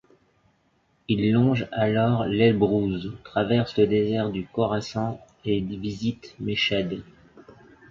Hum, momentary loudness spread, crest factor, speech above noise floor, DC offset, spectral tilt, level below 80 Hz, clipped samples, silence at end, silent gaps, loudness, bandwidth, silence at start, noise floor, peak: none; 11 LU; 18 dB; 43 dB; under 0.1%; -7.5 dB/octave; -52 dBFS; under 0.1%; 0.4 s; none; -24 LUFS; 7.4 kHz; 1.1 s; -66 dBFS; -8 dBFS